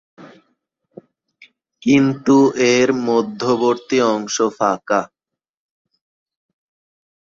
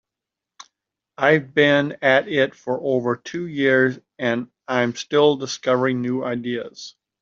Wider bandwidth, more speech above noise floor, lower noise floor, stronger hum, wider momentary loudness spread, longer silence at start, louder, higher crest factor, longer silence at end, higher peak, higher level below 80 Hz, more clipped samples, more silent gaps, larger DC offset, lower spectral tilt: about the same, 7.8 kHz vs 7.6 kHz; about the same, 69 dB vs 66 dB; about the same, -85 dBFS vs -86 dBFS; neither; second, 7 LU vs 10 LU; second, 0.2 s vs 1.2 s; first, -17 LUFS vs -20 LUFS; about the same, 18 dB vs 18 dB; first, 2.25 s vs 0.3 s; about the same, -2 dBFS vs -2 dBFS; about the same, -62 dBFS vs -66 dBFS; neither; neither; neither; about the same, -5 dB/octave vs -5 dB/octave